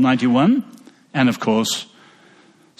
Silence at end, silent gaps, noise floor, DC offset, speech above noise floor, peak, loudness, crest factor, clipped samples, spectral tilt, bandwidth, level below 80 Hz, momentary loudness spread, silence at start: 0.95 s; none; -52 dBFS; under 0.1%; 35 dB; -4 dBFS; -18 LUFS; 16 dB; under 0.1%; -5 dB/octave; 13.5 kHz; -62 dBFS; 15 LU; 0 s